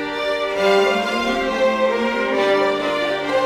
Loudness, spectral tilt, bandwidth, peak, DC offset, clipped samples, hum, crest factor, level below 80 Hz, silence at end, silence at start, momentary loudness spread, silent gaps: -19 LUFS; -4 dB/octave; 15.5 kHz; -6 dBFS; under 0.1%; under 0.1%; none; 14 dB; -50 dBFS; 0 s; 0 s; 4 LU; none